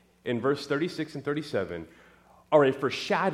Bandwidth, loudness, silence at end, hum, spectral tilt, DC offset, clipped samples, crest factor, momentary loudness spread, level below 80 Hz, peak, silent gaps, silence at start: 13.5 kHz; -28 LUFS; 0 s; none; -6 dB/octave; under 0.1%; under 0.1%; 20 dB; 12 LU; -66 dBFS; -8 dBFS; none; 0.25 s